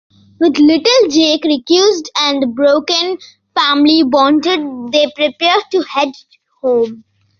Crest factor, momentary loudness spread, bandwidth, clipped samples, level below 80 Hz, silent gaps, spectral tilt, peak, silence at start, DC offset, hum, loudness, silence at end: 12 dB; 8 LU; 7.2 kHz; under 0.1%; -58 dBFS; none; -2.5 dB/octave; 0 dBFS; 0.4 s; under 0.1%; none; -12 LUFS; 0.4 s